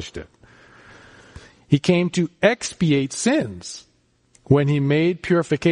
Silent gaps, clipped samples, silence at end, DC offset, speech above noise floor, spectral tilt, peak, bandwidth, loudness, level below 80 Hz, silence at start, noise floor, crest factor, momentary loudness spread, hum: none; under 0.1%; 0 s; under 0.1%; 40 dB; -6 dB/octave; -4 dBFS; 10.5 kHz; -20 LUFS; -52 dBFS; 0 s; -59 dBFS; 18 dB; 17 LU; none